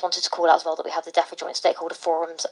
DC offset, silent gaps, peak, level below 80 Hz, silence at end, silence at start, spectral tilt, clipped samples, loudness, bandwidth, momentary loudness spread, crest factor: under 0.1%; none; -4 dBFS; under -90 dBFS; 0 s; 0 s; 0 dB/octave; under 0.1%; -23 LUFS; 11 kHz; 8 LU; 20 dB